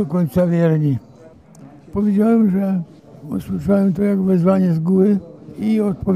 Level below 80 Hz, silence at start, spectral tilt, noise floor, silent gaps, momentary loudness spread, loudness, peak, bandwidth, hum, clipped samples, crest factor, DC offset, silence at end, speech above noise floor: -46 dBFS; 0 s; -10 dB/octave; -44 dBFS; none; 11 LU; -17 LUFS; -4 dBFS; 13 kHz; none; under 0.1%; 12 dB; under 0.1%; 0 s; 27 dB